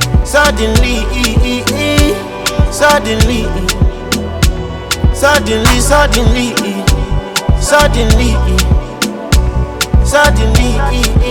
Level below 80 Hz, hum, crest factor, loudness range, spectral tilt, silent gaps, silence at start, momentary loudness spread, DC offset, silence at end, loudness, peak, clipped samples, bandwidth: -14 dBFS; none; 10 dB; 2 LU; -4.5 dB/octave; none; 0 s; 7 LU; under 0.1%; 0 s; -12 LUFS; 0 dBFS; 0.1%; 18.5 kHz